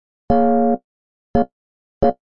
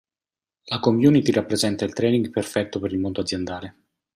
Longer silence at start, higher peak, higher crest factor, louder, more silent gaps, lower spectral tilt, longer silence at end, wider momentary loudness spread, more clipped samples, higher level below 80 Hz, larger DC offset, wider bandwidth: second, 0.3 s vs 0.65 s; about the same, -4 dBFS vs -4 dBFS; about the same, 16 dB vs 18 dB; first, -19 LUFS vs -22 LUFS; first, 0.84-1.34 s, 1.52-2.01 s vs none; first, -11 dB/octave vs -5.5 dB/octave; second, 0.2 s vs 0.45 s; second, 8 LU vs 13 LU; neither; first, -38 dBFS vs -60 dBFS; neither; second, 5.4 kHz vs 14.5 kHz